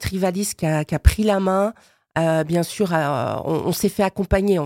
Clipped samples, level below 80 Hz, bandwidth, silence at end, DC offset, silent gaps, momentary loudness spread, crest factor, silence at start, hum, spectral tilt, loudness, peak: under 0.1%; -28 dBFS; 17 kHz; 0 s; under 0.1%; none; 5 LU; 20 dB; 0 s; none; -6 dB/octave; -21 LUFS; 0 dBFS